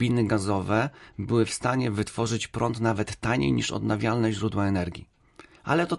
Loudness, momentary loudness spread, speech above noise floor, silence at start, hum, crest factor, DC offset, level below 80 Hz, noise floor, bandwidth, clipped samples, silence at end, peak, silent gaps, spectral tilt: -26 LUFS; 5 LU; 27 dB; 0 s; none; 16 dB; under 0.1%; -48 dBFS; -53 dBFS; 11.5 kHz; under 0.1%; 0 s; -10 dBFS; none; -6 dB/octave